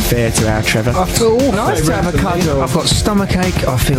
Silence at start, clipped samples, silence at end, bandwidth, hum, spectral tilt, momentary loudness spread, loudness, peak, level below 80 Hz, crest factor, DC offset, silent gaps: 0 s; under 0.1%; 0 s; 16.5 kHz; none; -5 dB/octave; 2 LU; -14 LUFS; 0 dBFS; -24 dBFS; 14 dB; under 0.1%; none